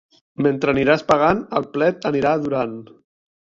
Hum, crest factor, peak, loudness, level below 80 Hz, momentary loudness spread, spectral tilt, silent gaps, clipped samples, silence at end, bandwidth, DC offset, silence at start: none; 18 dB; -2 dBFS; -19 LUFS; -50 dBFS; 8 LU; -7 dB/octave; none; under 0.1%; 0.6 s; 7.8 kHz; under 0.1%; 0.4 s